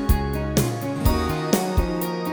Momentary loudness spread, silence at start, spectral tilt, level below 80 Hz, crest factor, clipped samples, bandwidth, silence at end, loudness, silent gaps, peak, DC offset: 4 LU; 0 s; -5.5 dB/octave; -28 dBFS; 20 dB; under 0.1%; over 20 kHz; 0 s; -23 LUFS; none; -2 dBFS; under 0.1%